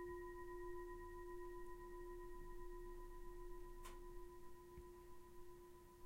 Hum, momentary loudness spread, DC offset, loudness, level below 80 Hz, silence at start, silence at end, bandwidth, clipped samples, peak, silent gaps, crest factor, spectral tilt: none; 9 LU; under 0.1%; -57 LUFS; -58 dBFS; 0 s; 0 s; 16 kHz; under 0.1%; -40 dBFS; none; 12 dB; -6 dB/octave